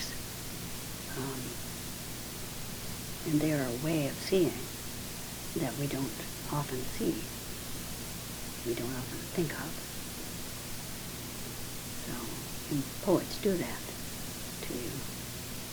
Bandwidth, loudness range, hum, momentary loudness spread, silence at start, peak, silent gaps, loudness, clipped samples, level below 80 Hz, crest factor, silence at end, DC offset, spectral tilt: over 20 kHz; 5 LU; none; 9 LU; 0 s; -14 dBFS; none; -36 LUFS; under 0.1%; -50 dBFS; 22 dB; 0 s; under 0.1%; -4.5 dB/octave